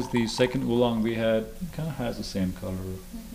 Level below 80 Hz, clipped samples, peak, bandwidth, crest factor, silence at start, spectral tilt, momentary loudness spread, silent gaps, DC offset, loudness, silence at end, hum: -44 dBFS; under 0.1%; -10 dBFS; 15.5 kHz; 18 dB; 0 s; -6 dB/octave; 11 LU; none; under 0.1%; -28 LUFS; 0 s; none